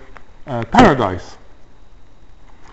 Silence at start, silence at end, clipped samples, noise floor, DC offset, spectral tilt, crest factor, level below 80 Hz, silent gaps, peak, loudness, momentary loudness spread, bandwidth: 0.1 s; 0.05 s; under 0.1%; -44 dBFS; under 0.1%; -6 dB/octave; 18 dB; -38 dBFS; none; 0 dBFS; -14 LUFS; 17 LU; 8.2 kHz